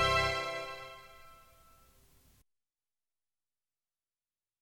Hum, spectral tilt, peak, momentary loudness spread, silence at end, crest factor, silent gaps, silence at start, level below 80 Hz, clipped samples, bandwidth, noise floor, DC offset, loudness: none; -3 dB/octave; -16 dBFS; 27 LU; 3.25 s; 24 dB; none; 0 s; -56 dBFS; under 0.1%; 17.5 kHz; under -90 dBFS; under 0.1%; -34 LUFS